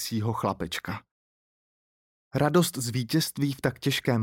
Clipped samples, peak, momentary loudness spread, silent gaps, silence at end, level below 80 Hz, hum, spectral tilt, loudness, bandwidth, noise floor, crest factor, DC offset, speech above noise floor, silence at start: under 0.1%; -10 dBFS; 10 LU; 1.11-2.31 s; 0 s; -60 dBFS; none; -5 dB/octave; -28 LUFS; 17 kHz; under -90 dBFS; 20 dB; under 0.1%; over 63 dB; 0 s